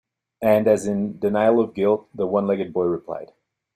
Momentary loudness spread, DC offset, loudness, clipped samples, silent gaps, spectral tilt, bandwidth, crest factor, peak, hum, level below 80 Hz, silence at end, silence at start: 7 LU; under 0.1%; -21 LUFS; under 0.1%; none; -7 dB/octave; 14.5 kHz; 16 dB; -4 dBFS; none; -62 dBFS; 0.5 s; 0.4 s